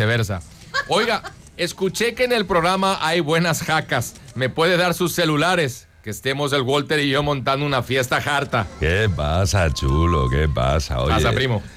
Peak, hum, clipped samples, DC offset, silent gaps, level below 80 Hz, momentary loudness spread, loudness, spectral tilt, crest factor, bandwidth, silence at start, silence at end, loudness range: -8 dBFS; none; under 0.1%; under 0.1%; none; -34 dBFS; 7 LU; -20 LUFS; -5 dB/octave; 12 dB; 16 kHz; 0 s; 0 s; 1 LU